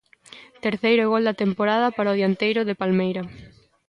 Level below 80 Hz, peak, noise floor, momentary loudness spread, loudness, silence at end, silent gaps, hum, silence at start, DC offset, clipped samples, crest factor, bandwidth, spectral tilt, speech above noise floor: -62 dBFS; -8 dBFS; -48 dBFS; 8 LU; -22 LUFS; 0.4 s; none; none; 0.3 s; under 0.1%; under 0.1%; 14 dB; 10.5 kHz; -7.5 dB/octave; 26 dB